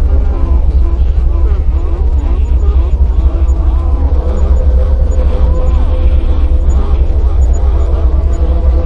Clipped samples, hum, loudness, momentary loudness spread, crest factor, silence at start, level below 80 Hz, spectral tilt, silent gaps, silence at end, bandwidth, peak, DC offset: under 0.1%; none; -13 LUFS; 2 LU; 8 dB; 0 s; -8 dBFS; -9 dB/octave; none; 0 s; 7.2 kHz; 0 dBFS; under 0.1%